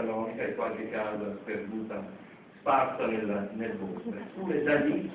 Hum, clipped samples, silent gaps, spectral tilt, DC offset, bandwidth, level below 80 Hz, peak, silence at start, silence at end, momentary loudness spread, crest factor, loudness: none; under 0.1%; none; -5 dB/octave; under 0.1%; 4 kHz; -66 dBFS; -14 dBFS; 0 s; 0 s; 12 LU; 18 dB; -32 LUFS